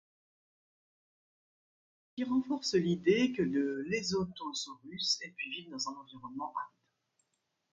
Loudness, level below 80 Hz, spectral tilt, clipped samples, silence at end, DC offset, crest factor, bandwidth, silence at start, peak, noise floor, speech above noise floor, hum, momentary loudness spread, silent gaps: -34 LUFS; -70 dBFS; -4.5 dB/octave; under 0.1%; 1.05 s; under 0.1%; 20 dB; 9.4 kHz; 2.15 s; -16 dBFS; -82 dBFS; 48 dB; none; 13 LU; none